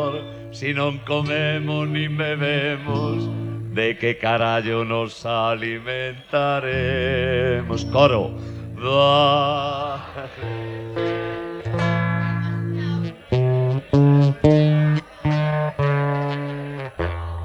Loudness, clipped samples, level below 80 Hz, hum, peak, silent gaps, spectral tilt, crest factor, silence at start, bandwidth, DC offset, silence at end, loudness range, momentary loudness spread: -21 LUFS; under 0.1%; -44 dBFS; none; 0 dBFS; none; -7.5 dB/octave; 20 dB; 0 s; 8 kHz; under 0.1%; 0 s; 4 LU; 13 LU